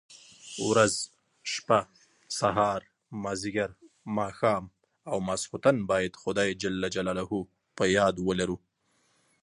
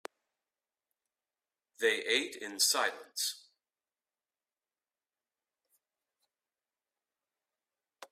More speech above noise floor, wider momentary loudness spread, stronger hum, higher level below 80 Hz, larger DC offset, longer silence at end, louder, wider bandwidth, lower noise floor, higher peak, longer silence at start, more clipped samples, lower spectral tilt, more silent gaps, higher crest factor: second, 43 dB vs over 57 dB; about the same, 15 LU vs 13 LU; neither; first, -58 dBFS vs -88 dBFS; neither; first, 0.85 s vs 0.05 s; about the same, -29 LUFS vs -31 LUFS; second, 11.5 kHz vs 15.5 kHz; second, -71 dBFS vs under -90 dBFS; first, -8 dBFS vs -16 dBFS; second, 0.1 s vs 1.8 s; neither; first, -4 dB/octave vs 1 dB/octave; neither; about the same, 22 dB vs 24 dB